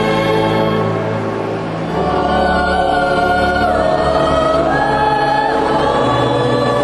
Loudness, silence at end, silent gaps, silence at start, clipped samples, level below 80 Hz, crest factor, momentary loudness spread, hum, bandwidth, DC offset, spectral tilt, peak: -14 LUFS; 0 s; none; 0 s; under 0.1%; -32 dBFS; 14 dB; 5 LU; none; 12.5 kHz; under 0.1%; -6 dB/octave; -2 dBFS